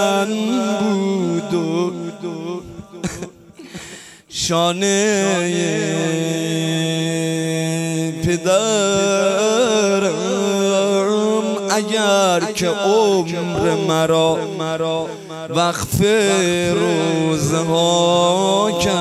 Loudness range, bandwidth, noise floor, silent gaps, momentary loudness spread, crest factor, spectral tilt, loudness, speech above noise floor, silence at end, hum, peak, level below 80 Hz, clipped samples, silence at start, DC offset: 5 LU; 16 kHz; -38 dBFS; none; 13 LU; 14 dB; -4.5 dB/octave; -17 LUFS; 21 dB; 0 s; none; -4 dBFS; -48 dBFS; under 0.1%; 0 s; under 0.1%